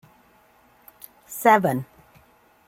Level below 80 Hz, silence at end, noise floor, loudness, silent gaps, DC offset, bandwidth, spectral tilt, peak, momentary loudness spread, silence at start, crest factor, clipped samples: -66 dBFS; 0.85 s; -57 dBFS; -20 LUFS; none; under 0.1%; 16.5 kHz; -5.5 dB/octave; -4 dBFS; 27 LU; 1.3 s; 22 dB; under 0.1%